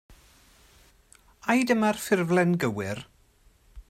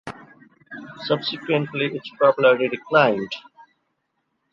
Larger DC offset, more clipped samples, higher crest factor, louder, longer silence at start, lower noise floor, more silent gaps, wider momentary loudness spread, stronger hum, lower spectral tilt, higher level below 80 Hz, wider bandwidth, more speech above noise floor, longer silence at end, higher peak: neither; neither; about the same, 20 dB vs 20 dB; second, -25 LUFS vs -21 LUFS; about the same, 0.1 s vs 0.05 s; second, -60 dBFS vs -74 dBFS; neither; second, 12 LU vs 21 LU; neither; about the same, -5.5 dB/octave vs -6.5 dB/octave; first, -58 dBFS vs -68 dBFS; first, 15.5 kHz vs 7.2 kHz; second, 36 dB vs 54 dB; second, 0.1 s vs 1.15 s; second, -8 dBFS vs -4 dBFS